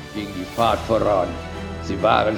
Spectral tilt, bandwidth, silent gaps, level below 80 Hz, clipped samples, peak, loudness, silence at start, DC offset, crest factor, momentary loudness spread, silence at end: -6 dB/octave; 19.5 kHz; none; -40 dBFS; under 0.1%; -4 dBFS; -22 LUFS; 0 s; under 0.1%; 18 dB; 12 LU; 0 s